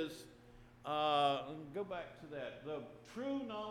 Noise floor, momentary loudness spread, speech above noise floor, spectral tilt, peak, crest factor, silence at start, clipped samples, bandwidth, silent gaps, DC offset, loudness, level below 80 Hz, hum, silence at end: -61 dBFS; 17 LU; 21 dB; -5 dB/octave; -22 dBFS; 20 dB; 0 s; under 0.1%; 15.5 kHz; none; under 0.1%; -40 LUFS; -70 dBFS; none; 0 s